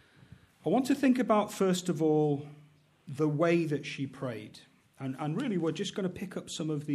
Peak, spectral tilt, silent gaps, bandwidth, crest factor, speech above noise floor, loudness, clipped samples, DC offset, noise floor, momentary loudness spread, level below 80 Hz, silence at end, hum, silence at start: -12 dBFS; -6 dB/octave; none; 14.5 kHz; 18 dB; 27 dB; -31 LUFS; under 0.1%; under 0.1%; -57 dBFS; 13 LU; -72 dBFS; 0 s; none; 0.65 s